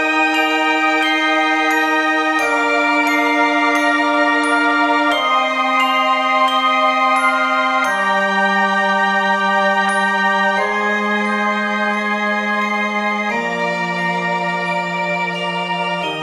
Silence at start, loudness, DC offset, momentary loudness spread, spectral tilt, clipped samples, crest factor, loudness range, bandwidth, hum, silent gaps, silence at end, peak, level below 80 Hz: 0 s; -15 LUFS; under 0.1%; 5 LU; -4 dB/octave; under 0.1%; 14 dB; 4 LU; 13.5 kHz; none; none; 0 s; -2 dBFS; -64 dBFS